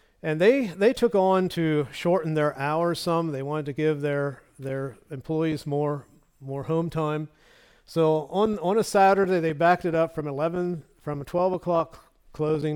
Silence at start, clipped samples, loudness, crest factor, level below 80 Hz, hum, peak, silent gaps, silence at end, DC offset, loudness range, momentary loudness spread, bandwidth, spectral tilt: 0.25 s; under 0.1%; -25 LUFS; 16 dB; -58 dBFS; none; -8 dBFS; none; 0 s; under 0.1%; 6 LU; 13 LU; 17.5 kHz; -6.5 dB/octave